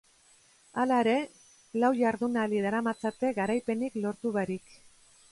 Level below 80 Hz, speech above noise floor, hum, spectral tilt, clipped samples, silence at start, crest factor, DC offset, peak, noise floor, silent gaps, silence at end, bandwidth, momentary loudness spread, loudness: -70 dBFS; 33 dB; none; -6 dB/octave; under 0.1%; 0.75 s; 16 dB; under 0.1%; -14 dBFS; -62 dBFS; none; 0.75 s; 11.5 kHz; 10 LU; -30 LUFS